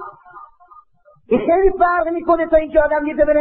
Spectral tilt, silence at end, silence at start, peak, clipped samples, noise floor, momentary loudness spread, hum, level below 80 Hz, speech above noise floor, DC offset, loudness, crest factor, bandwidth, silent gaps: -10.5 dB/octave; 0 s; 0 s; -2 dBFS; under 0.1%; -52 dBFS; 5 LU; none; -34 dBFS; 37 dB; under 0.1%; -16 LUFS; 14 dB; 4.3 kHz; none